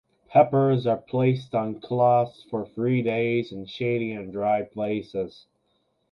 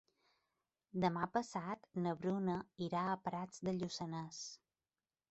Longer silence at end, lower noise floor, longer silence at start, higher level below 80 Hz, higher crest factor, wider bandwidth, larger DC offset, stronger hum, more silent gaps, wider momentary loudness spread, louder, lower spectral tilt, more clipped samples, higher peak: about the same, 0.8 s vs 0.75 s; second, -71 dBFS vs under -90 dBFS; second, 0.3 s vs 0.95 s; first, -64 dBFS vs -76 dBFS; about the same, 20 dB vs 20 dB; second, 6.2 kHz vs 8 kHz; neither; neither; neither; about the same, 12 LU vs 10 LU; first, -25 LUFS vs -41 LUFS; first, -9 dB/octave vs -5.5 dB/octave; neither; first, -4 dBFS vs -22 dBFS